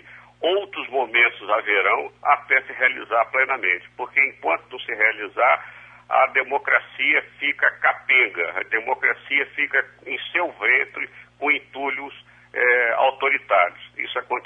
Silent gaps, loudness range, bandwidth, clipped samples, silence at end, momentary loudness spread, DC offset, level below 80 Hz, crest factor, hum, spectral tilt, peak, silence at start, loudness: none; 2 LU; 7.2 kHz; under 0.1%; 0.05 s; 10 LU; under 0.1%; -68 dBFS; 18 dB; 60 Hz at -60 dBFS; -4.5 dB/octave; -4 dBFS; 0.1 s; -20 LUFS